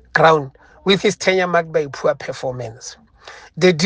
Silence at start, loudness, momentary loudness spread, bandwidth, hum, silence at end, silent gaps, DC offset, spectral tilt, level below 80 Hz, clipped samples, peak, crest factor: 0.15 s; -18 LUFS; 20 LU; 9.8 kHz; none; 0 s; none; under 0.1%; -4.5 dB/octave; -54 dBFS; under 0.1%; 0 dBFS; 18 dB